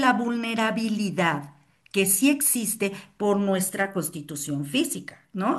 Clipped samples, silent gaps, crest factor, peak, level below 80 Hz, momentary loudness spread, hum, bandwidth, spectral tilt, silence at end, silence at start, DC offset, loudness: under 0.1%; none; 18 dB; -6 dBFS; -68 dBFS; 11 LU; none; 13 kHz; -3.5 dB/octave; 0 s; 0 s; under 0.1%; -25 LUFS